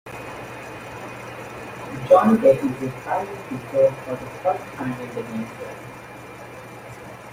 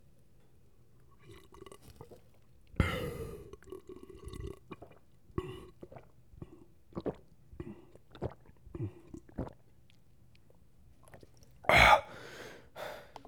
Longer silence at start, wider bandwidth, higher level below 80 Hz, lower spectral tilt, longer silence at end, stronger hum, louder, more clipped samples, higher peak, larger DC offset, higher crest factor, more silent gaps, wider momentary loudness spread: second, 0.05 s vs 1.3 s; second, 16 kHz vs over 20 kHz; second, -56 dBFS vs -50 dBFS; first, -7 dB/octave vs -4.5 dB/octave; second, 0 s vs 0.25 s; neither; first, -22 LUFS vs -32 LUFS; neither; first, -2 dBFS vs -8 dBFS; second, under 0.1% vs 0.1%; second, 22 dB vs 28 dB; neither; second, 22 LU vs 27 LU